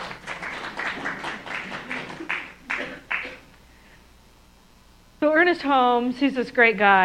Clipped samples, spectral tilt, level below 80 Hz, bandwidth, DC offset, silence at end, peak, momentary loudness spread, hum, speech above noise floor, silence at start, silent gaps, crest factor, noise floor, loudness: under 0.1%; -5 dB/octave; -56 dBFS; 14.5 kHz; under 0.1%; 0 s; -2 dBFS; 13 LU; none; 34 dB; 0 s; none; 22 dB; -53 dBFS; -23 LUFS